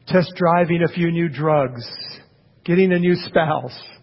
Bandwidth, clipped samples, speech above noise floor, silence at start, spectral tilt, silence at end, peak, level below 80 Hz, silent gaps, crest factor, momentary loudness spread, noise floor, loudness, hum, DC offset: 5.8 kHz; under 0.1%; 31 dB; 0.05 s; -11.5 dB/octave; 0.1 s; -4 dBFS; -54 dBFS; none; 16 dB; 15 LU; -49 dBFS; -19 LUFS; none; under 0.1%